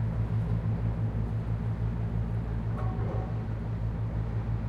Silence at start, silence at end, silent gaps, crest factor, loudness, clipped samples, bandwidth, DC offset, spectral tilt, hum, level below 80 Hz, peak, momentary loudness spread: 0 s; 0 s; none; 12 dB; -32 LUFS; under 0.1%; 4.8 kHz; under 0.1%; -10 dB/octave; none; -36 dBFS; -18 dBFS; 3 LU